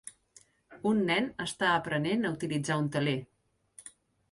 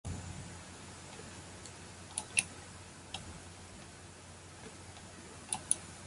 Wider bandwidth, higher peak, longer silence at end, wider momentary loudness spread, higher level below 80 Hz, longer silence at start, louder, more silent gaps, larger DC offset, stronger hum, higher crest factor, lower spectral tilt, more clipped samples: about the same, 11.5 kHz vs 11.5 kHz; second, -14 dBFS vs -10 dBFS; first, 0.4 s vs 0 s; first, 22 LU vs 17 LU; second, -66 dBFS vs -58 dBFS; about the same, 0.05 s vs 0.05 s; first, -30 LUFS vs -42 LUFS; neither; neither; neither; second, 18 dB vs 34 dB; first, -5 dB/octave vs -2 dB/octave; neither